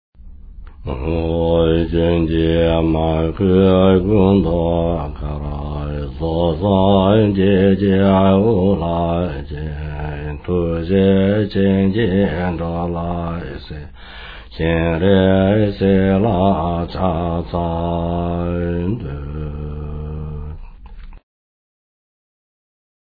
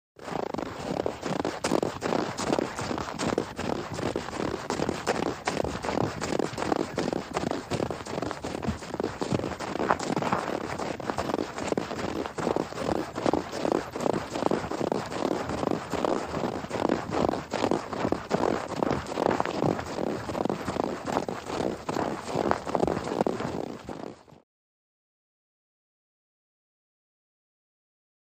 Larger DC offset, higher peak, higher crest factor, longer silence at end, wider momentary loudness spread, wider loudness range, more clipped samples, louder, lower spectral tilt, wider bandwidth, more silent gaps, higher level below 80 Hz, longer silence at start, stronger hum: neither; about the same, -2 dBFS vs -4 dBFS; second, 14 dB vs 26 dB; second, 2 s vs 3.95 s; first, 15 LU vs 5 LU; first, 10 LU vs 2 LU; neither; first, -17 LUFS vs -30 LUFS; first, -11.5 dB/octave vs -5.5 dB/octave; second, 4.9 kHz vs 15.5 kHz; neither; first, -30 dBFS vs -52 dBFS; about the same, 0.2 s vs 0.2 s; neither